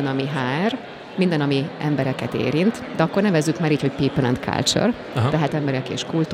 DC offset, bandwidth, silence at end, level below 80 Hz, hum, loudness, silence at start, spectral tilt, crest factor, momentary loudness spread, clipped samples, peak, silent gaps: under 0.1%; 15.5 kHz; 0 s; -52 dBFS; none; -21 LUFS; 0 s; -5.5 dB/octave; 16 dB; 5 LU; under 0.1%; -4 dBFS; none